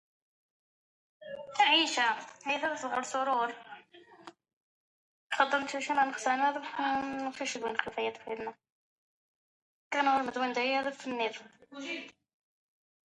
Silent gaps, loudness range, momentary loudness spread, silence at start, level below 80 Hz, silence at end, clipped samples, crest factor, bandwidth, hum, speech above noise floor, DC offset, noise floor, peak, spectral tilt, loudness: 4.53-5.30 s, 8.72-9.91 s; 5 LU; 16 LU; 1.2 s; -78 dBFS; 0.95 s; under 0.1%; 24 dB; 11 kHz; none; 25 dB; under 0.1%; -57 dBFS; -10 dBFS; -1.5 dB/octave; -31 LUFS